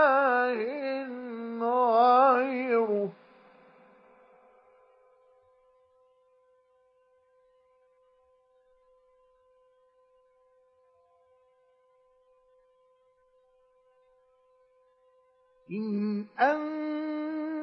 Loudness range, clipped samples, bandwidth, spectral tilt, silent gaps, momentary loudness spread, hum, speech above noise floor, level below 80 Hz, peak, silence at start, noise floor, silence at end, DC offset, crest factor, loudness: 14 LU; under 0.1%; 6 kHz; -8 dB/octave; none; 15 LU; none; 38 dB; -86 dBFS; -10 dBFS; 0 s; -67 dBFS; 0 s; under 0.1%; 22 dB; -27 LUFS